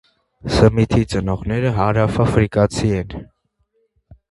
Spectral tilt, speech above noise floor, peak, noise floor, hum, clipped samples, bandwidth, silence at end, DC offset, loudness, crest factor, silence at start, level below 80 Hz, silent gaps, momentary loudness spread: -7 dB/octave; 49 dB; 0 dBFS; -66 dBFS; none; under 0.1%; 11.5 kHz; 1.05 s; under 0.1%; -17 LUFS; 18 dB; 0.45 s; -34 dBFS; none; 10 LU